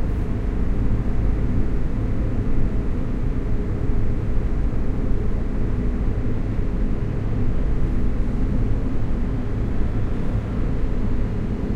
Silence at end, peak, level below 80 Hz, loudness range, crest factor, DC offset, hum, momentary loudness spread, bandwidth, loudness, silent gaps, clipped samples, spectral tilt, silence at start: 0 s; -6 dBFS; -22 dBFS; 1 LU; 12 dB; under 0.1%; none; 2 LU; 4.4 kHz; -25 LUFS; none; under 0.1%; -9.5 dB/octave; 0 s